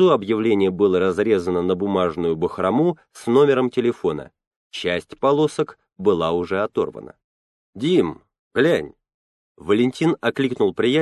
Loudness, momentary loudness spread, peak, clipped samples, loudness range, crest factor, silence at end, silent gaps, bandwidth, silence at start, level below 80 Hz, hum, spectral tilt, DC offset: -20 LUFS; 9 LU; -4 dBFS; under 0.1%; 4 LU; 16 dB; 0 s; 4.47-4.70 s, 7.24-7.73 s, 8.39-8.51 s, 9.14-9.55 s; 12 kHz; 0 s; -52 dBFS; none; -6.5 dB/octave; under 0.1%